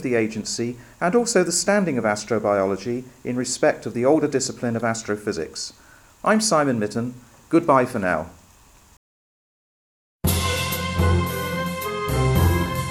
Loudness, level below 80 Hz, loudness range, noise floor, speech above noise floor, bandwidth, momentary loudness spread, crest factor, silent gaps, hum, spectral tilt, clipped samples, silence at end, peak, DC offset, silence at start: -22 LUFS; -40 dBFS; 4 LU; -52 dBFS; 30 dB; 17 kHz; 9 LU; 18 dB; 8.97-10.19 s; none; -5 dB/octave; under 0.1%; 0 s; -4 dBFS; under 0.1%; 0 s